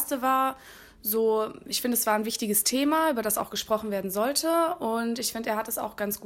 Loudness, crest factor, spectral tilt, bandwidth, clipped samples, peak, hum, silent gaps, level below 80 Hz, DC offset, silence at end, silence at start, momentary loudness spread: -26 LUFS; 18 dB; -2.5 dB/octave; 16.5 kHz; under 0.1%; -10 dBFS; none; none; -62 dBFS; under 0.1%; 0 s; 0 s; 6 LU